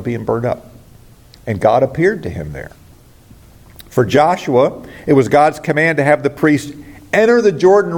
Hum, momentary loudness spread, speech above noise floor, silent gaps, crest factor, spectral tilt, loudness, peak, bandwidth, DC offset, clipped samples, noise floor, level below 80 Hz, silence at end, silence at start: none; 15 LU; 29 dB; none; 14 dB; -6.5 dB/octave; -14 LUFS; 0 dBFS; 17 kHz; under 0.1%; under 0.1%; -43 dBFS; -46 dBFS; 0 s; 0 s